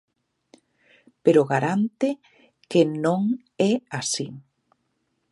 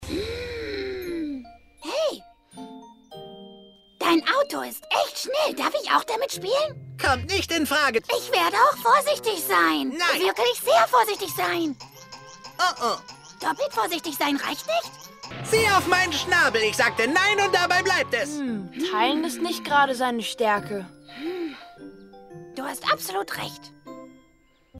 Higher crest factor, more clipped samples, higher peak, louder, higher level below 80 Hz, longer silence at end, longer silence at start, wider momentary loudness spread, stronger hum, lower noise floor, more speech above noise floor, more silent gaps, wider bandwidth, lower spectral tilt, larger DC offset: about the same, 20 dB vs 18 dB; neither; about the same, -4 dBFS vs -6 dBFS; about the same, -23 LUFS vs -23 LUFS; second, -74 dBFS vs -54 dBFS; first, 0.9 s vs 0 s; first, 1.25 s vs 0 s; second, 8 LU vs 21 LU; neither; first, -73 dBFS vs -60 dBFS; first, 51 dB vs 37 dB; neither; second, 11.5 kHz vs 16 kHz; first, -5.5 dB/octave vs -3 dB/octave; neither